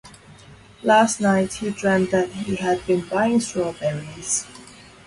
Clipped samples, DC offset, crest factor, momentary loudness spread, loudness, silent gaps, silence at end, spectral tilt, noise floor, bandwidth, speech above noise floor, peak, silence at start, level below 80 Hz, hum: under 0.1%; under 0.1%; 18 dB; 10 LU; -21 LUFS; none; 0.25 s; -4.5 dB/octave; -46 dBFS; 11.5 kHz; 26 dB; -4 dBFS; 0.05 s; -54 dBFS; none